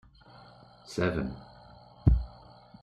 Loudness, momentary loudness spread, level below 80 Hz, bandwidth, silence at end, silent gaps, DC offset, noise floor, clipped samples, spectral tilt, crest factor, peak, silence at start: -31 LUFS; 26 LU; -36 dBFS; 10 kHz; 0.5 s; none; under 0.1%; -54 dBFS; under 0.1%; -7.5 dB/octave; 24 dB; -8 dBFS; 0.9 s